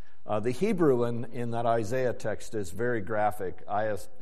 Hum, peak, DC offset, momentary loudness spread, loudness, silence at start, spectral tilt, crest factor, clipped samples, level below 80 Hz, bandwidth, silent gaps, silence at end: none; -12 dBFS; 3%; 10 LU; -30 LUFS; 0.25 s; -6.5 dB/octave; 16 dB; under 0.1%; -60 dBFS; 14 kHz; none; 0.15 s